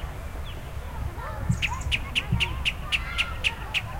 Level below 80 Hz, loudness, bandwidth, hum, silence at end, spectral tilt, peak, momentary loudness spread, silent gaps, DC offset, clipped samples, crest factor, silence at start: -34 dBFS; -28 LUFS; 16.5 kHz; none; 0 s; -3.5 dB/octave; -10 dBFS; 12 LU; none; under 0.1%; under 0.1%; 18 dB; 0 s